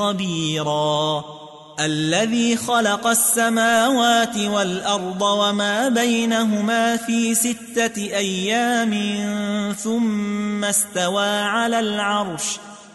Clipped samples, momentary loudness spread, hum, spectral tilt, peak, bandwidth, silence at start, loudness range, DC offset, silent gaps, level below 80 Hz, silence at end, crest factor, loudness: under 0.1%; 7 LU; none; -3 dB/octave; -6 dBFS; 12 kHz; 0 s; 3 LU; under 0.1%; none; -62 dBFS; 0.05 s; 14 dB; -19 LUFS